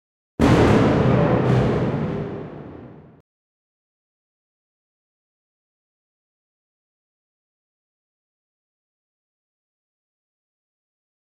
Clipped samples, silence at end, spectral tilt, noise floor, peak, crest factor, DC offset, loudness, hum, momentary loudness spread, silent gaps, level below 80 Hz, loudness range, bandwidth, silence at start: under 0.1%; 8.3 s; -8 dB/octave; -41 dBFS; -4 dBFS; 20 dB; under 0.1%; -18 LUFS; none; 21 LU; none; -40 dBFS; 19 LU; 11 kHz; 0.4 s